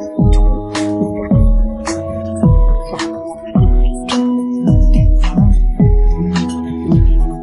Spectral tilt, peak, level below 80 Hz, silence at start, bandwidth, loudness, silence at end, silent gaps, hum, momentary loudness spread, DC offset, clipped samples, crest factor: -7.5 dB/octave; 0 dBFS; -14 dBFS; 0 s; 10.5 kHz; -15 LUFS; 0 s; none; none; 8 LU; under 0.1%; under 0.1%; 12 dB